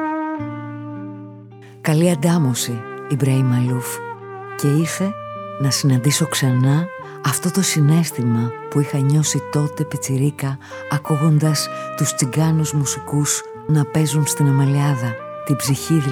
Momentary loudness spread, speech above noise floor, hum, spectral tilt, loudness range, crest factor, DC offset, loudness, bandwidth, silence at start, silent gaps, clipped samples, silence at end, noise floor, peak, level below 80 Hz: 13 LU; 22 dB; none; -5.5 dB/octave; 2 LU; 16 dB; under 0.1%; -19 LUFS; 17.5 kHz; 0 s; none; under 0.1%; 0 s; -40 dBFS; -2 dBFS; -58 dBFS